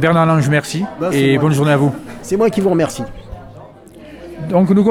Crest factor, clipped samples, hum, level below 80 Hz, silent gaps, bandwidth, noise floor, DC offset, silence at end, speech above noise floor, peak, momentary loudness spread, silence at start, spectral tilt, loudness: 14 dB; under 0.1%; none; -44 dBFS; none; 15.5 kHz; -38 dBFS; under 0.1%; 0 s; 24 dB; -2 dBFS; 21 LU; 0 s; -6.5 dB/octave; -15 LUFS